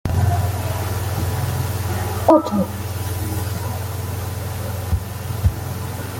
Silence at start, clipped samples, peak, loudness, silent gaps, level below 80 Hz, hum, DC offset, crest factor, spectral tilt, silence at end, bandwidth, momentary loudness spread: 0.05 s; under 0.1%; -2 dBFS; -22 LUFS; none; -36 dBFS; none; under 0.1%; 20 dB; -6 dB/octave; 0 s; 17 kHz; 11 LU